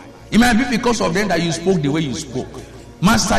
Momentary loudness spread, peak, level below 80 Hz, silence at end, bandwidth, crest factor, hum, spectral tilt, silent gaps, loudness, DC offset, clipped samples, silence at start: 14 LU; -2 dBFS; -34 dBFS; 0 s; 13.5 kHz; 16 dB; none; -4.5 dB/octave; none; -18 LUFS; under 0.1%; under 0.1%; 0 s